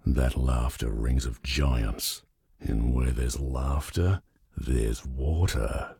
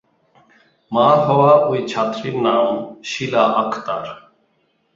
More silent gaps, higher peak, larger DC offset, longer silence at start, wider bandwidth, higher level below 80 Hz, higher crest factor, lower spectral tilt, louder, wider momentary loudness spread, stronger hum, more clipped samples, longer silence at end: neither; second, -14 dBFS vs -2 dBFS; neither; second, 0.05 s vs 0.9 s; first, 17 kHz vs 7.8 kHz; first, -30 dBFS vs -60 dBFS; about the same, 14 dB vs 16 dB; about the same, -5.5 dB/octave vs -6 dB/octave; second, -29 LUFS vs -17 LUFS; second, 6 LU vs 13 LU; neither; neither; second, 0.05 s vs 0.75 s